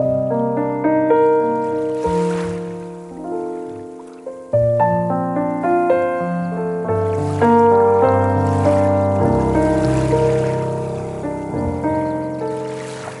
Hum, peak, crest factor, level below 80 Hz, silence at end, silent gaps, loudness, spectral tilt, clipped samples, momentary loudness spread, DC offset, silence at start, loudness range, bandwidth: none; -2 dBFS; 16 dB; -40 dBFS; 0 s; none; -18 LUFS; -8 dB/octave; under 0.1%; 13 LU; under 0.1%; 0 s; 6 LU; 11.5 kHz